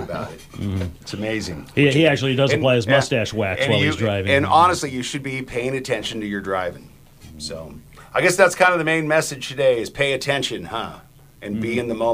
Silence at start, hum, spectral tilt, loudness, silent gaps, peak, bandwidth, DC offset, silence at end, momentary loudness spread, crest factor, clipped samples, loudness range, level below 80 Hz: 0 s; none; -4.5 dB/octave; -20 LUFS; none; 0 dBFS; 15.5 kHz; under 0.1%; 0 s; 15 LU; 20 dB; under 0.1%; 5 LU; -48 dBFS